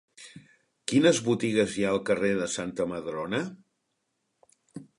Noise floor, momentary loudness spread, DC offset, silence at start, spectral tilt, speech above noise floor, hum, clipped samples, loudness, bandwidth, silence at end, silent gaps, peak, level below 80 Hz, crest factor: -78 dBFS; 25 LU; under 0.1%; 0.2 s; -4.5 dB/octave; 52 dB; none; under 0.1%; -27 LUFS; 11.5 kHz; 0.15 s; none; -8 dBFS; -64 dBFS; 20 dB